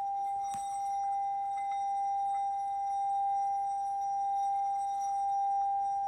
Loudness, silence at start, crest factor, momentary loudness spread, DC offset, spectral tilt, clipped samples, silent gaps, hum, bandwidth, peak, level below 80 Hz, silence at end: -33 LUFS; 0 s; 6 dB; 3 LU; under 0.1%; -1.5 dB/octave; under 0.1%; none; none; 11.5 kHz; -26 dBFS; -72 dBFS; 0 s